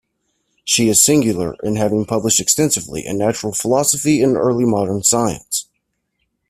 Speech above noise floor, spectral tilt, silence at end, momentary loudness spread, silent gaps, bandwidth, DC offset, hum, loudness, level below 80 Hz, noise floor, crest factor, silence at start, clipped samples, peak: 55 dB; -3.5 dB/octave; 0.85 s; 10 LU; none; 16 kHz; under 0.1%; none; -16 LUFS; -50 dBFS; -71 dBFS; 18 dB; 0.65 s; under 0.1%; 0 dBFS